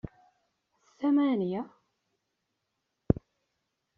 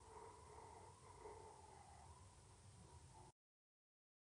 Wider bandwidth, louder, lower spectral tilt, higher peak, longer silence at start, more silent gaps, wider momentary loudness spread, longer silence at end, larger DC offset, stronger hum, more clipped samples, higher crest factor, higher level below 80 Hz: second, 4.7 kHz vs 10.5 kHz; first, -30 LUFS vs -63 LUFS; first, -8 dB/octave vs -4.5 dB/octave; first, -8 dBFS vs -46 dBFS; about the same, 0.05 s vs 0 s; neither; first, 16 LU vs 6 LU; about the same, 0.85 s vs 0.95 s; neither; neither; neither; first, 26 dB vs 18 dB; first, -52 dBFS vs -74 dBFS